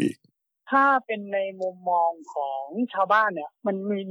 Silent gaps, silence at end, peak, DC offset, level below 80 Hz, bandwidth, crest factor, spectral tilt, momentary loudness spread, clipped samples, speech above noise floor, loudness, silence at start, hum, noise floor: none; 0 s; -10 dBFS; under 0.1%; -82 dBFS; 11 kHz; 16 dB; -6.5 dB/octave; 10 LU; under 0.1%; 43 dB; -25 LUFS; 0 s; none; -68 dBFS